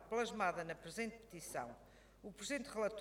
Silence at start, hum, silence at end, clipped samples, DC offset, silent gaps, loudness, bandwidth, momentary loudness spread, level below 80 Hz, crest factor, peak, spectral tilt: 0 s; none; 0 s; under 0.1%; under 0.1%; none; -44 LUFS; 17.5 kHz; 15 LU; -68 dBFS; 22 dB; -22 dBFS; -3.5 dB/octave